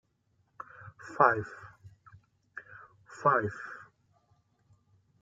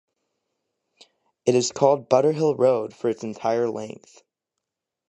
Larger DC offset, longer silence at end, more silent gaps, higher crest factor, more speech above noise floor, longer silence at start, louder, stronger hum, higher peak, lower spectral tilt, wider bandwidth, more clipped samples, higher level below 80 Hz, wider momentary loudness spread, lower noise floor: neither; first, 1.4 s vs 1.15 s; neither; first, 28 dB vs 20 dB; second, 45 dB vs 62 dB; second, 0.8 s vs 1.45 s; second, -28 LUFS vs -22 LUFS; neither; second, -8 dBFS vs -4 dBFS; first, -7 dB/octave vs -5.5 dB/octave; second, 7.8 kHz vs 8.8 kHz; neither; about the same, -72 dBFS vs -72 dBFS; first, 26 LU vs 8 LU; second, -73 dBFS vs -84 dBFS